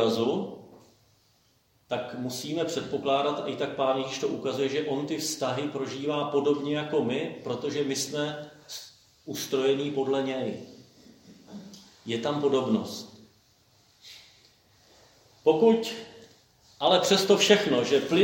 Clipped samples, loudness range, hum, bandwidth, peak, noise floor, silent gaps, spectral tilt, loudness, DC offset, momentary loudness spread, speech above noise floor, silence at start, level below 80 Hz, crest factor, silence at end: under 0.1%; 6 LU; none; 16.5 kHz; -4 dBFS; -66 dBFS; none; -4 dB/octave; -27 LUFS; under 0.1%; 22 LU; 40 dB; 0 s; -72 dBFS; 24 dB; 0 s